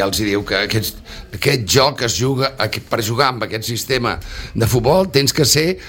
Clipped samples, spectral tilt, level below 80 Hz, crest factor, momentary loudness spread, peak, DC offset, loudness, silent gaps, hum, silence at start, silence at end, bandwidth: under 0.1%; -4 dB/octave; -38 dBFS; 18 dB; 9 LU; 0 dBFS; under 0.1%; -17 LUFS; none; none; 0 s; 0 s; 17 kHz